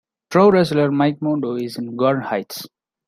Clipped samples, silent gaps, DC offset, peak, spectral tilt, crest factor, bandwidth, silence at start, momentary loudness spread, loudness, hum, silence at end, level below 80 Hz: under 0.1%; none; under 0.1%; -2 dBFS; -7 dB/octave; 16 dB; 16 kHz; 0.3 s; 13 LU; -18 LUFS; none; 0.4 s; -60 dBFS